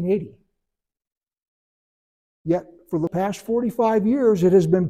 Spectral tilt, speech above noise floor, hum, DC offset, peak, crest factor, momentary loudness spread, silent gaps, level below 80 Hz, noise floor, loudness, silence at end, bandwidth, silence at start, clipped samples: -8 dB/octave; 64 dB; none; under 0.1%; -6 dBFS; 16 dB; 11 LU; 1.48-2.45 s; -58 dBFS; -84 dBFS; -21 LUFS; 0 s; 15 kHz; 0 s; under 0.1%